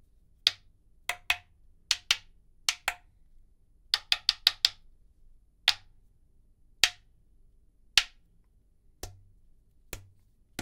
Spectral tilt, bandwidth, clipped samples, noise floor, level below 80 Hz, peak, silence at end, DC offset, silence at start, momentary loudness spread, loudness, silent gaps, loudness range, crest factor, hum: 1.5 dB/octave; 16 kHz; under 0.1%; -63 dBFS; -58 dBFS; 0 dBFS; 0 s; under 0.1%; 0.45 s; 21 LU; -28 LUFS; none; 5 LU; 34 dB; none